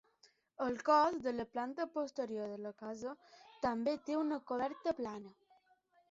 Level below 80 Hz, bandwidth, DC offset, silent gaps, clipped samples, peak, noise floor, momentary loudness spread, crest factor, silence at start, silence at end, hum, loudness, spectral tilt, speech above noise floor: -74 dBFS; 7.6 kHz; under 0.1%; none; under 0.1%; -18 dBFS; -73 dBFS; 15 LU; 20 dB; 0.6 s; 0.8 s; none; -38 LUFS; -3.5 dB/octave; 35 dB